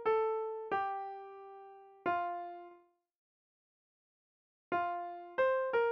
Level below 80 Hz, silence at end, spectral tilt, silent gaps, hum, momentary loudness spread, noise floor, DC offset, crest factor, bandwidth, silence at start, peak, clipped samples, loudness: -78 dBFS; 0 s; -2 dB/octave; 3.18-4.71 s; none; 20 LU; -63 dBFS; under 0.1%; 16 dB; 6 kHz; 0 s; -22 dBFS; under 0.1%; -36 LUFS